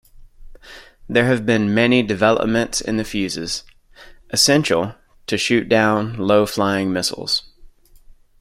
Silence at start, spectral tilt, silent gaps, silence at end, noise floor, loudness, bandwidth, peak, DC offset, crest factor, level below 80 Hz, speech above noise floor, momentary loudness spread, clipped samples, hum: 0.2 s; -4 dB/octave; none; 0.75 s; -46 dBFS; -18 LUFS; 16.5 kHz; -2 dBFS; under 0.1%; 18 dB; -46 dBFS; 28 dB; 8 LU; under 0.1%; none